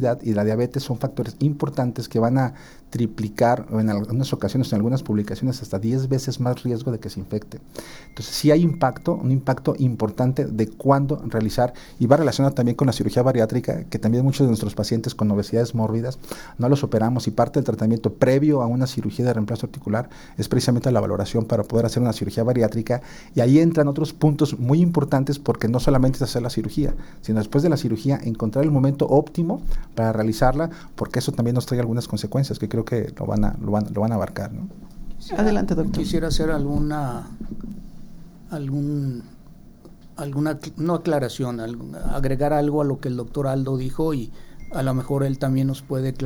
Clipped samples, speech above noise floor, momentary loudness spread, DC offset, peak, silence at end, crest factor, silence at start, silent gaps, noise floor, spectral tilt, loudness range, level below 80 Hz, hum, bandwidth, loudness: under 0.1%; 23 dB; 11 LU; under 0.1%; -2 dBFS; 0 s; 20 dB; 0 s; none; -44 dBFS; -7.5 dB/octave; 6 LU; -36 dBFS; none; 18 kHz; -22 LUFS